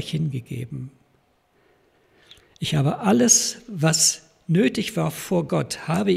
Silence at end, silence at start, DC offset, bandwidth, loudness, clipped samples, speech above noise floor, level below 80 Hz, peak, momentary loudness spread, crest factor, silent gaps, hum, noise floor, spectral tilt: 0 s; 0 s; under 0.1%; 15.5 kHz; -21 LUFS; under 0.1%; 42 dB; -58 dBFS; -2 dBFS; 16 LU; 20 dB; none; none; -63 dBFS; -4 dB/octave